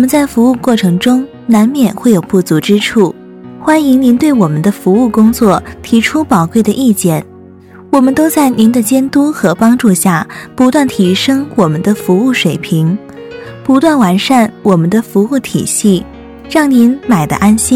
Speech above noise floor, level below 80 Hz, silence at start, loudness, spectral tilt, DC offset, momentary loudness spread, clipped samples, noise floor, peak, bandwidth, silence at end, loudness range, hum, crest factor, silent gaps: 25 dB; -42 dBFS; 0 s; -10 LUFS; -5.5 dB/octave; under 0.1%; 6 LU; 0.2%; -35 dBFS; 0 dBFS; 16.5 kHz; 0 s; 2 LU; none; 10 dB; none